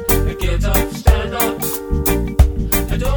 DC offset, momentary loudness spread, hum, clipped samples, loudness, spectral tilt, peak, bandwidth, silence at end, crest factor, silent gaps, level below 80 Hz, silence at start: under 0.1%; 4 LU; none; under 0.1%; -17 LUFS; -5 dB/octave; 0 dBFS; over 20 kHz; 0 s; 16 dB; none; -18 dBFS; 0 s